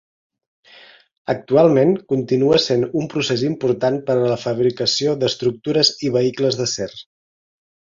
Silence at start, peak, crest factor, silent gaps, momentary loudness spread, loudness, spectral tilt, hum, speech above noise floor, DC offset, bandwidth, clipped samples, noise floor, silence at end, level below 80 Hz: 1.3 s; -2 dBFS; 18 dB; none; 8 LU; -18 LUFS; -5 dB/octave; none; 29 dB; under 0.1%; 7.6 kHz; under 0.1%; -47 dBFS; 0.9 s; -58 dBFS